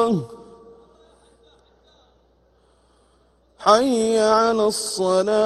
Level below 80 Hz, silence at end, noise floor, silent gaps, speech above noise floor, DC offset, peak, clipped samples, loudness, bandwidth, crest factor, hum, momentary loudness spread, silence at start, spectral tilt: -58 dBFS; 0 s; -59 dBFS; none; 41 dB; under 0.1%; 0 dBFS; under 0.1%; -19 LUFS; 13 kHz; 22 dB; none; 7 LU; 0 s; -4 dB/octave